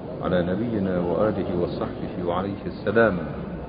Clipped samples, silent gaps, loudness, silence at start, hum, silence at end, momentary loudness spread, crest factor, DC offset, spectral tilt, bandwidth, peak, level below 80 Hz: under 0.1%; none; -25 LUFS; 0 s; none; 0 s; 9 LU; 18 dB; under 0.1%; -12 dB/octave; 5.2 kHz; -6 dBFS; -44 dBFS